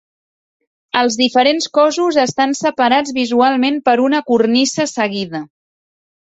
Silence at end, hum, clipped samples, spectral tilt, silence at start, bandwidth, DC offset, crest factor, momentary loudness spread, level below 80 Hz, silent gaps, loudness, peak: 0.75 s; none; under 0.1%; -3.5 dB/octave; 0.95 s; 8.2 kHz; under 0.1%; 14 dB; 6 LU; -60 dBFS; none; -14 LUFS; 0 dBFS